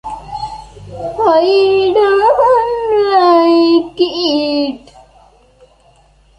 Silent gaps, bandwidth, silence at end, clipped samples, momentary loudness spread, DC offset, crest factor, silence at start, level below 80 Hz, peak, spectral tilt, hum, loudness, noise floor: none; 10.5 kHz; 1.6 s; under 0.1%; 17 LU; under 0.1%; 12 dB; 0.05 s; -44 dBFS; -2 dBFS; -5.5 dB/octave; none; -11 LUFS; -49 dBFS